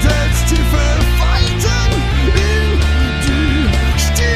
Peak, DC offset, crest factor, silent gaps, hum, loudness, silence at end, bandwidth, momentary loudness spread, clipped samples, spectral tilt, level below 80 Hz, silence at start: 0 dBFS; under 0.1%; 12 dB; none; none; -14 LUFS; 0 s; 15.5 kHz; 1 LU; under 0.1%; -4.5 dB/octave; -14 dBFS; 0 s